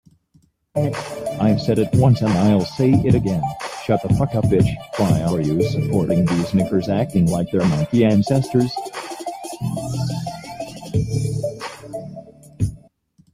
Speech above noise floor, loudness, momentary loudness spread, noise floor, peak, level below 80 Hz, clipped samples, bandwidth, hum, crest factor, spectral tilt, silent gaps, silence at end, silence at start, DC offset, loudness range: 41 dB; -20 LUFS; 14 LU; -58 dBFS; -2 dBFS; -42 dBFS; under 0.1%; 15 kHz; none; 16 dB; -7.5 dB/octave; none; 0.55 s; 0.75 s; under 0.1%; 8 LU